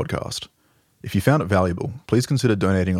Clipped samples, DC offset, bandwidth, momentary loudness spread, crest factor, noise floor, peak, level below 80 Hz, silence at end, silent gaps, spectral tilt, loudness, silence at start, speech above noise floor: under 0.1%; under 0.1%; 16 kHz; 12 LU; 20 dB; -61 dBFS; -2 dBFS; -52 dBFS; 0 s; none; -6.5 dB/octave; -22 LUFS; 0 s; 41 dB